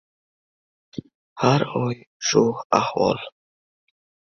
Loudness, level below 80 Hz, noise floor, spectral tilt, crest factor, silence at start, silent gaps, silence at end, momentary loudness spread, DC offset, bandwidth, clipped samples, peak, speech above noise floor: -22 LUFS; -60 dBFS; under -90 dBFS; -5 dB/octave; 22 dB; 0.95 s; 1.15-1.36 s, 2.07-2.20 s, 2.65-2.70 s; 1 s; 19 LU; under 0.1%; 7.4 kHz; under 0.1%; -2 dBFS; over 69 dB